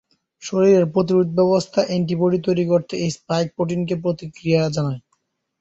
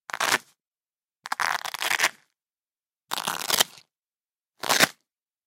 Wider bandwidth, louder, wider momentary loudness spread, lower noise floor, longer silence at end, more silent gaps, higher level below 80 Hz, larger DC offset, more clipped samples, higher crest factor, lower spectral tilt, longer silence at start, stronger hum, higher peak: second, 8 kHz vs 16.5 kHz; first, -20 LUFS vs -25 LUFS; second, 10 LU vs 13 LU; second, -70 dBFS vs under -90 dBFS; about the same, 0.6 s vs 0.55 s; second, none vs 0.67-0.71 s; first, -58 dBFS vs -72 dBFS; neither; neither; second, 16 dB vs 30 dB; first, -7 dB/octave vs 0 dB/octave; first, 0.4 s vs 0.15 s; neither; second, -4 dBFS vs 0 dBFS